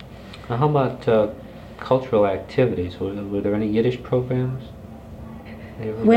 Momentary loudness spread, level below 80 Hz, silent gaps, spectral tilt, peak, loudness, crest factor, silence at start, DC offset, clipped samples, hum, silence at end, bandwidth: 19 LU; -46 dBFS; none; -9 dB/octave; -4 dBFS; -22 LUFS; 18 dB; 0 s; under 0.1%; under 0.1%; none; 0 s; 8.8 kHz